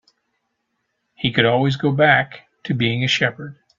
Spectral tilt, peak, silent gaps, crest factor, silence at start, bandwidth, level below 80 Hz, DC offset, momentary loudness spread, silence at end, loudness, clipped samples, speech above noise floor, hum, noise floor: -5.5 dB/octave; 0 dBFS; none; 20 dB; 1.2 s; 7.6 kHz; -54 dBFS; under 0.1%; 14 LU; 0.25 s; -18 LUFS; under 0.1%; 55 dB; none; -73 dBFS